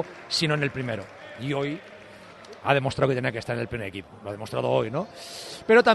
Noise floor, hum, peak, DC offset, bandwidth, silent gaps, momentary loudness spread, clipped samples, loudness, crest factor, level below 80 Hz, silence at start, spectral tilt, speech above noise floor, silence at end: -46 dBFS; none; -4 dBFS; under 0.1%; 12.5 kHz; none; 17 LU; under 0.1%; -27 LUFS; 22 dB; -58 dBFS; 0 s; -5.5 dB/octave; 21 dB; 0 s